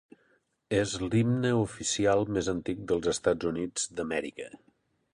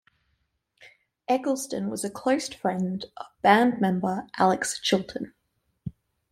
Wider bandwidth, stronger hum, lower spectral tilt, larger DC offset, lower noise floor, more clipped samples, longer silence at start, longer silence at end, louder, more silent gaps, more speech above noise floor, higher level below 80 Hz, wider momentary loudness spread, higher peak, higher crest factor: second, 11.5 kHz vs 15.5 kHz; neither; about the same, -5 dB/octave vs -4.5 dB/octave; neither; second, -70 dBFS vs -74 dBFS; neither; about the same, 0.7 s vs 0.8 s; first, 0.55 s vs 0.4 s; second, -29 LUFS vs -25 LUFS; neither; second, 41 dB vs 49 dB; first, -54 dBFS vs -64 dBFS; second, 8 LU vs 20 LU; second, -10 dBFS vs -4 dBFS; about the same, 20 dB vs 22 dB